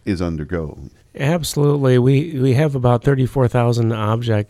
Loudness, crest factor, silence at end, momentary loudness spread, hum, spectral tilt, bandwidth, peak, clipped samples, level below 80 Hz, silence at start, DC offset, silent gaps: -17 LUFS; 16 dB; 0.05 s; 9 LU; none; -7 dB/octave; 14.5 kHz; -2 dBFS; under 0.1%; -40 dBFS; 0.05 s; under 0.1%; none